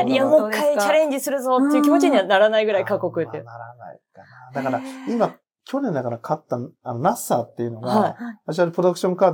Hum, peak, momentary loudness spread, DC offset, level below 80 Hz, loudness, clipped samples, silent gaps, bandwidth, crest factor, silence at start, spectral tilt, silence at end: none; -4 dBFS; 13 LU; under 0.1%; -78 dBFS; -21 LUFS; under 0.1%; none; 18 kHz; 16 dB; 0 s; -5.5 dB/octave; 0 s